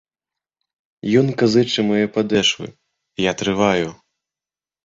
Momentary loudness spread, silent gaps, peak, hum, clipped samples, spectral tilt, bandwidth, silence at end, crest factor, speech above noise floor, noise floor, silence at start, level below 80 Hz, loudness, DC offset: 12 LU; none; -2 dBFS; none; under 0.1%; -5 dB/octave; 7.8 kHz; 0.95 s; 18 dB; over 72 dB; under -90 dBFS; 1.05 s; -54 dBFS; -18 LUFS; under 0.1%